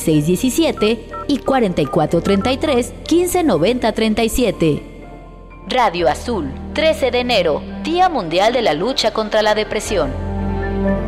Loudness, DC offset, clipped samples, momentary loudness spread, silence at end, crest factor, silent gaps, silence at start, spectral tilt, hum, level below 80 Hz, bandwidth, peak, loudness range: -17 LUFS; under 0.1%; under 0.1%; 7 LU; 0 s; 12 dB; none; 0 s; -5 dB/octave; none; -34 dBFS; 16 kHz; -4 dBFS; 2 LU